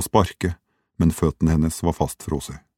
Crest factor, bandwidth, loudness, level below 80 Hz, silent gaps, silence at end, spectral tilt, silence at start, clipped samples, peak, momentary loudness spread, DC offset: 22 dB; 18 kHz; -23 LUFS; -34 dBFS; none; 0.2 s; -6.5 dB/octave; 0 s; under 0.1%; 0 dBFS; 8 LU; under 0.1%